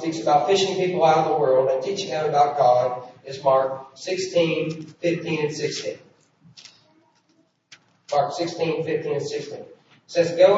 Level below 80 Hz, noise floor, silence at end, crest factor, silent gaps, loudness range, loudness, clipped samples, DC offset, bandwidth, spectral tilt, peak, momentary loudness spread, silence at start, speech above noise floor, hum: -72 dBFS; -64 dBFS; 0 s; 20 dB; none; 10 LU; -22 LUFS; under 0.1%; under 0.1%; 8 kHz; -5 dB/octave; -4 dBFS; 12 LU; 0 s; 43 dB; none